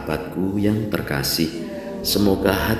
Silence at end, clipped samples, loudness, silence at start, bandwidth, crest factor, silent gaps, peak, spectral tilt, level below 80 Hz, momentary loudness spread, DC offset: 0 s; under 0.1%; -22 LUFS; 0 s; 16 kHz; 20 dB; none; -2 dBFS; -5 dB/octave; -38 dBFS; 8 LU; under 0.1%